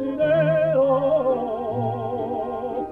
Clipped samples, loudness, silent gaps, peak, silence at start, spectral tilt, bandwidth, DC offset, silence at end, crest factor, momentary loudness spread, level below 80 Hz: under 0.1%; -22 LUFS; none; -10 dBFS; 0 s; -9.5 dB/octave; 4.3 kHz; under 0.1%; 0 s; 12 dB; 8 LU; -54 dBFS